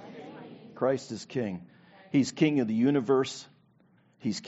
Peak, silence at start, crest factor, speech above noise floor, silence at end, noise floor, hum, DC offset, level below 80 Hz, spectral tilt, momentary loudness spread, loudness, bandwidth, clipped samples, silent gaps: -10 dBFS; 0 s; 20 dB; 36 dB; 0 s; -64 dBFS; none; under 0.1%; -74 dBFS; -6 dB/octave; 20 LU; -29 LUFS; 8 kHz; under 0.1%; none